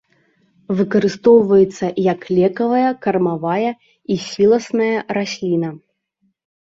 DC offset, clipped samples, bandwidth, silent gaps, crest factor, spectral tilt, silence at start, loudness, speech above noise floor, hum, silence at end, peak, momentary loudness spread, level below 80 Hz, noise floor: under 0.1%; under 0.1%; 7.8 kHz; none; 16 dB; -6.5 dB/octave; 0.7 s; -17 LUFS; 50 dB; none; 0.9 s; -2 dBFS; 11 LU; -58 dBFS; -66 dBFS